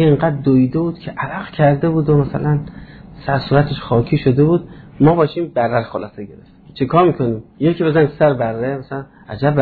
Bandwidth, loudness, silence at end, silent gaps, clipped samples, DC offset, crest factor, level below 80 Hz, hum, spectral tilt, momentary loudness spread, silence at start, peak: 4.7 kHz; -16 LUFS; 0 s; none; under 0.1%; under 0.1%; 14 dB; -42 dBFS; none; -11.5 dB/octave; 14 LU; 0 s; -2 dBFS